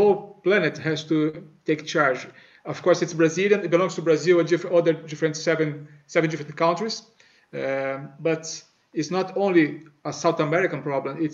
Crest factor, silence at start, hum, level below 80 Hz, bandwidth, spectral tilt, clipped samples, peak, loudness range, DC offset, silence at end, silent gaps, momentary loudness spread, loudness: 18 dB; 0 s; none; -74 dBFS; 7.8 kHz; -5.5 dB/octave; under 0.1%; -6 dBFS; 5 LU; under 0.1%; 0 s; none; 13 LU; -23 LUFS